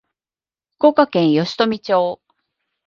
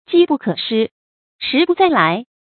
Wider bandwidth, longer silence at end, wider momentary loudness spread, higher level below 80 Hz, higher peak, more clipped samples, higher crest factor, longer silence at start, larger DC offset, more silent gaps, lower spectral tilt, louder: first, 7.2 kHz vs 4.6 kHz; first, 0.7 s vs 0.3 s; second, 7 LU vs 11 LU; about the same, -64 dBFS vs -62 dBFS; about the same, 0 dBFS vs 0 dBFS; neither; about the same, 18 dB vs 16 dB; first, 0.8 s vs 0.1 s; neither; second, none vs 0.91-1.39 s; second, -6.5 dB/octave vs -10.5 dB/octave; about the same, -17 LUFS vs -16 LUFS